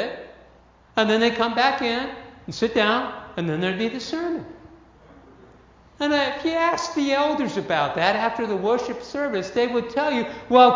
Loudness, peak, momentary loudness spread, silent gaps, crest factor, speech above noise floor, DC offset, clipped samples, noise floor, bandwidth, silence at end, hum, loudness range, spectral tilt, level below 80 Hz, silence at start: -23 LUFS; -2 dBFS; 10 LU; none; 22 dB; 31 dB; under 0.1%; under 0.1%; -53 dBFS; 7.6 kHz; 0 s; none; 5 LU; -4.5 dB/octave; -56 dBFS; 0 s